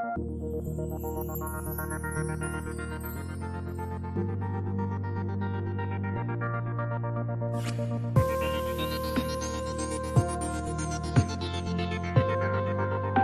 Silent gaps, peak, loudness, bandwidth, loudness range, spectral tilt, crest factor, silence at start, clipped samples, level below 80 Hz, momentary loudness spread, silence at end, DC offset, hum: none; -10 dBFS; -31 LUFS; 14.5 kHz; 5 LU; -6.5 dB/octave; 20 dB; 0 s; under 0.1%; -40 dBFS; 7 LU; 0 s; under 0.1%; none